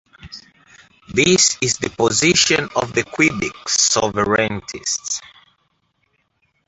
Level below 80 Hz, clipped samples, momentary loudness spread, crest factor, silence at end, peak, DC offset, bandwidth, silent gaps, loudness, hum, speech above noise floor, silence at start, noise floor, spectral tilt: -50 dBFS; under 0.1%; 13 LU; 18 dB; 1.4 s; -2 dBFS; under 0.1%; 8.4 kHz; none; -17 LUFS; none; 49 dB; 0.25 s; -66 dBFS; -2.5 dB/octave